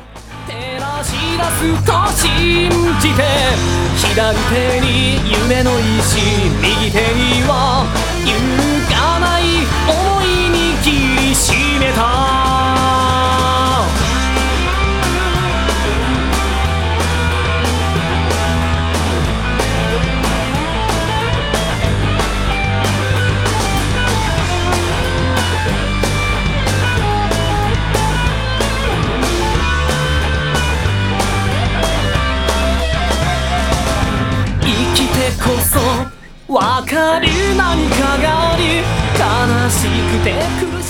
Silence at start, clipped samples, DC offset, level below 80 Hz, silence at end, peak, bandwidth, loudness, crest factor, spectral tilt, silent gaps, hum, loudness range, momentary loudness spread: 0 s; under 0.1%; under 0.1%; -22 dBFS; 0 s; 0 dBFS; 18.5 kHz; -14 LUFS; 14 dB; -4.5 dB/octave; none; none; 3 LU; 4 LU